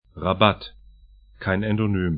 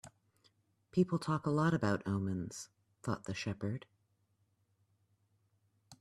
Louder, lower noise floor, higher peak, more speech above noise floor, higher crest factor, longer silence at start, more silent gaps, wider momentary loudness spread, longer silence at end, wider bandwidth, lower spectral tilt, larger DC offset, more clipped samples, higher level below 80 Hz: first, -23 LUFS vs -36 LUFS; second, -51 dBFS vs -77 dBFS; first, 0 dBFS vs -18 dBFS; second, 29 dB vs 42 dB; about the same, 24 dB vs 20 dB; about the same, 0.15 s vs 0.05 s; neither; about the same, 13 LU vs 13 LU; about the same, 0 s vs 0.05 s; second, 5 kHz vs 13 kHz; first, -11 dB/octave vs -6.5 dB/octave; neither; neither; first, -46 dBFS vs -70 dBFS